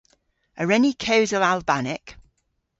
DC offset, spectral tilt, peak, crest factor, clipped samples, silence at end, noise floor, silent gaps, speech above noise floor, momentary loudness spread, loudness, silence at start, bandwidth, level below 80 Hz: under 0.1%; -4.5 dB/octave; -6 dBFS; 18 dB; under 0.1%; 0.6 s; -72 dBFS; none; 51 dB; 10 LU; -21 LUFS; 0.55 s; 8 kHz; -56 dBFS